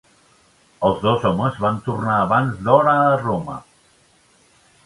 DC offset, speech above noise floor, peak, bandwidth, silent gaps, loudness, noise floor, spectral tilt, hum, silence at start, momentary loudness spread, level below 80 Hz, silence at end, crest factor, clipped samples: under 0.1%; 38 dB; 0 dBFS; 11.5 kHz; none; -18 LUFS; -56 dBFS; -7.5 dB/octave; none; 0.8 s; 9 LU; -50 dBFS; 1.25 s; 20 dB; under 0.1%